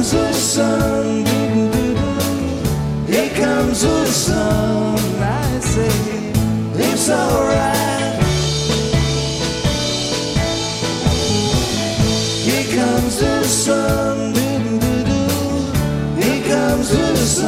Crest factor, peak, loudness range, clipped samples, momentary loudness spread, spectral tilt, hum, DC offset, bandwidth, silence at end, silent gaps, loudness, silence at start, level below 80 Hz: 16 dB; -2 dBFS; 1 LU; under 0.1%; 4 LU; -4.5 dB/octave; none; under 0.1%; 16 kHz; 0 s; none; -17 LUFS; 0 s; -30 dBFS